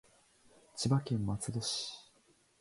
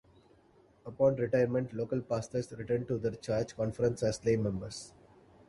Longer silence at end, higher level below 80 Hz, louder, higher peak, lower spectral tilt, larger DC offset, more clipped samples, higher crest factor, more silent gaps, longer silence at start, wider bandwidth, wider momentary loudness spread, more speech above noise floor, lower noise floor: about the same, 0.6 s vs 0.6 s; about the same, -62 dBFS vs -60 dBFS; about the same, -35 LUFS vs -33 LUFS; about the same, -18 dBFS vs -16 dBFS; second, -5 dB/octave vs -6.5 dB/octave; neither; neither; about the same, 20 dB vs 18 dB; neither; about the same, 0.75 s vs 0.85 s; about the same, 11.5 kHz vs 11.5 kHz; about the same, 14 LU vs 13 LU; about the same, 35 dB vs 32 dB; first, -69 dBFS vs -64 dBFS